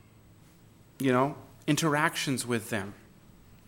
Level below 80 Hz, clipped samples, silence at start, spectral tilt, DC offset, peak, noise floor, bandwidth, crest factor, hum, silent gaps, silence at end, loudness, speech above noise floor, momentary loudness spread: -64 dBFS; under 0.1%; 1 s; -4.5 dB/octave; under 0.1%; -10 dBFS; -57 dBFS; 17 kHz; 22 dB; none; none; 0.7 s; -29 LUFS; 28 dB; 9 LU